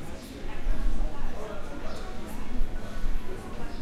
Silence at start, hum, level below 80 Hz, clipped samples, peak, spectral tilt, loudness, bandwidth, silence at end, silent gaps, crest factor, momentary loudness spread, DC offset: 0 s; none; -30 dBFS; under 0.1%; -12 dBFS; -6 dB/octave; -38 LUFS; 7.8 kHz; 0 s; none; 12 dB; 5 LU; under 0.1%